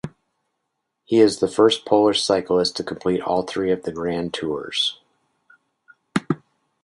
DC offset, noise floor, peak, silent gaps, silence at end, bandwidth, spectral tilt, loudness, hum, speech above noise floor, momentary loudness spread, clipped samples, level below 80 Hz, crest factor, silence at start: under 0.1%; -77 dBFS; -2 dBFS; none; 0.5 s; 11.5 kHz; -4.5 dB/octave; -21 LUFS; none; 57 dB; 10 LU; under 0.1%; -56 dBFS; 20 dB; 0.05 s